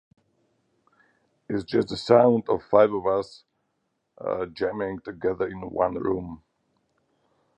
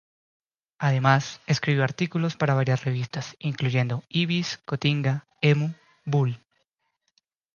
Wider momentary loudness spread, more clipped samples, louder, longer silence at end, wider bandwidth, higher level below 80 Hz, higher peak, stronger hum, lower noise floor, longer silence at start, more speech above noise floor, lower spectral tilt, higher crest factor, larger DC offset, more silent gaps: first, 13 LU vs 8 LU; neither; about the same, -24 LUFS vs -25 LUFS; about the same, 1.2 s vs 1.2 s; first, 9.4 kHz vs 7.2 kHz; first, -58 dBFS vs -64 dBFS; first, -2 dBFS vs -6 dBFS; neither; about the same, -76 dBFS vs -76 dBFS; first, 1.5 s vs 0.8 s; about the same, 52 dB vs 52 dB; about the same, -7 dB/octave vs -6 dB/octave; about the same, 24 dB vs 20 dB; neither; neither